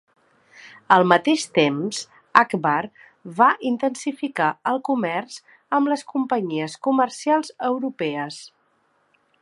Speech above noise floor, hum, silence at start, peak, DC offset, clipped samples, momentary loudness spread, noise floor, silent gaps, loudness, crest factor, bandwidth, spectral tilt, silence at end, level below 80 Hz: 44 dB; none; 0.6 s; 0 dBFS; under 0.1%; under 0.1%; 12 LU; -65 dBFS; none; -21 LUFS; 22 dB; 11.5 kHz; -4.5 dB/octave; 0.95 s; -72 dBFS